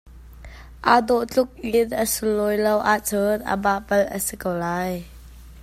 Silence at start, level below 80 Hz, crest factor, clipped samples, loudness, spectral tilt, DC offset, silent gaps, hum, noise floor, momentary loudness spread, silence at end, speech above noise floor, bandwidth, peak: 0.05 s; -46 dBFS; 22 dB; under 0.1%; -22 LUFS; -4 dB/octave; under 0.1%; none; none; -42 dBFS; 7 LU; 0 s; 21 dB; 16 kHz; 0 dBFS